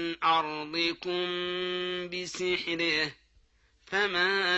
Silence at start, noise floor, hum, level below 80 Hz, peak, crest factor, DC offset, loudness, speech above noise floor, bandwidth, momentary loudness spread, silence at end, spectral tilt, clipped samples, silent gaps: 0 s; -65 dBFS; none; -66 dBFS; -14 dBFS; 16 dB; under 0.1%; -29 LUFS; 35 dB; 8.4 kHz; 7 LU; 0 s; -3 dB/octave; under 0.1%; none